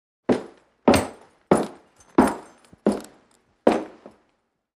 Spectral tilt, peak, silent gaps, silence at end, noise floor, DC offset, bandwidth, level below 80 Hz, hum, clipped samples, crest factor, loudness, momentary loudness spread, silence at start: -5.5 dB/octave; -2 dBFS; none; 0.9 s; -71 dBFS; under 0.1%; 15 kHz; -50 dBFS; none; under 0.1%; 24 dB; -23 LUFS; 14 LU; 0.3 s